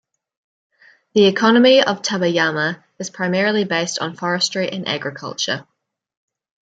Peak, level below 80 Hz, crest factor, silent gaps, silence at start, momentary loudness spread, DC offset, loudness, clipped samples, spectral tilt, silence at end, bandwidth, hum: -2 dBFS; -66 dBFS; 18 dB; none; 1.15 s; 12 LU; under 0.1%; -18 LUFS; under 0.1%; -4 dB/octave; 1.1 s; 9.2 kHz; none